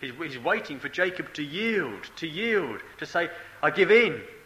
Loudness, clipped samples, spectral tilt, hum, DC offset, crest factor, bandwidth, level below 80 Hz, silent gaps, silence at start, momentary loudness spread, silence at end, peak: -26 LUFS; under 0.1%; -5 dB/octave; none; under 0.1%; 20 dB; 15.5 kHz; -66 dBFS; none; 0 s; 15 LU; 0.05 s; -8 dBFS